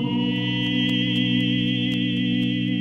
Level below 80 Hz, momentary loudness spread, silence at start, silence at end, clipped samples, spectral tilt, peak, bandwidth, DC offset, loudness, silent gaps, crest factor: -52 dBFS; 2 LU; 0 s; 0 s; under 0.1%; -6.5 dB/octave; -10 dBFS; 7.8 kHz; under 0.1%; -22 LUFS; none; 12 dB